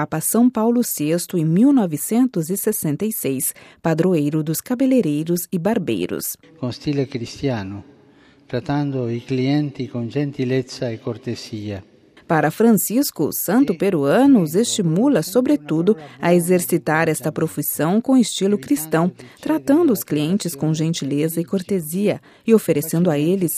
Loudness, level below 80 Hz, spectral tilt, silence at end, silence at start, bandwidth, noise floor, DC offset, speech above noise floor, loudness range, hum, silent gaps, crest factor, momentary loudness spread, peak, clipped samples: -19 LUFS; -60 dBFS; -5.5 dB/octave; 0 s; 0 s; 16 kHz; -51 dBFS; under 0.1%; 32 dB; 7 LU; none; none; 18 dB; 10 LU; -2 dBFS; under 0.1%